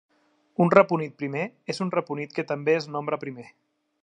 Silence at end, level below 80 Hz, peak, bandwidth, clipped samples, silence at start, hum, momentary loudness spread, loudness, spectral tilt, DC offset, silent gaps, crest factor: 0.6 s; -72 dBFS; 0 dBFS; 10.5 kHz; under 0.1%; 0.6 s; none; 13 LU; -25 LUFS; -7 dB/octave; under 0.1%; none; 26 dB